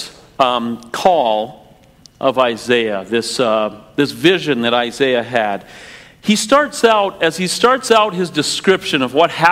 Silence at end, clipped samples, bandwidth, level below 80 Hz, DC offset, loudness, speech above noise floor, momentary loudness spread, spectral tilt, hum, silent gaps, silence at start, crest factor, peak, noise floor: 0 s; under 0.1%; 16 kHz; -54 dBFS; under 0.1%; -15 LUFS; 31 dB; 8 LU; -3.5 dB/octave; none; none; 0 s; 16 dB; 0 dBFS; -46 dBFS